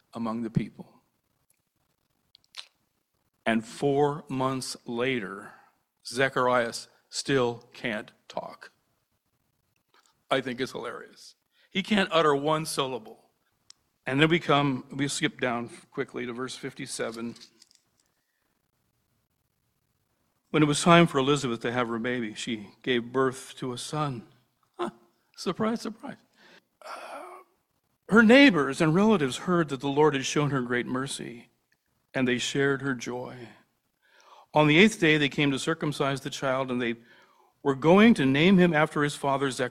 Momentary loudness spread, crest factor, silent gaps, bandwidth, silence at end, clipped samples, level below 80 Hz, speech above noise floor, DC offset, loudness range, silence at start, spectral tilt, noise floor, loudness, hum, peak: 19 LU; 24 dB; none; 14 kHz; 0 s; under 0.1%; -62 dBFS; 50 dB; under 0.1%; 13 LU; 0.15 s; -5 dB/octave; -75 dBFS; -26 LUFS; none; -4 dBFS